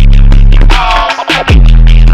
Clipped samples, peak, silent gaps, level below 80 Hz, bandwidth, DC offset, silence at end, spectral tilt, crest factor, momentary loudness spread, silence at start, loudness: 20%; 0 dBFS; none; -4 dBFS; 7.6 kHz; under 0.1%; 0 s; -6 dB/octave; 2 dB; 4 LU; 0 s; -7 LUFS